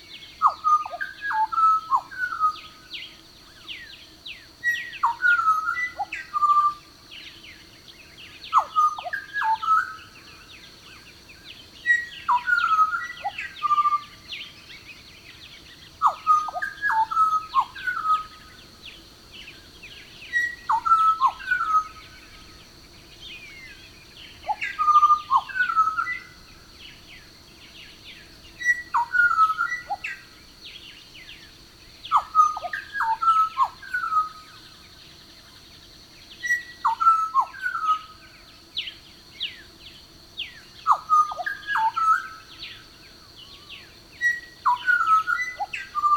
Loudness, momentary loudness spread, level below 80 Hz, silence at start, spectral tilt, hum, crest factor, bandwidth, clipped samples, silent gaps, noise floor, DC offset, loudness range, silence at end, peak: -23 LUFS; 24 LU; -58 dBFS; 0.1 s; -1 dB/octave; none; 20 dB; 18.5 kHz; under 0.1%; none; -49 dBFS; under 0.1%; 5 LU; 0 s; -4 dBFS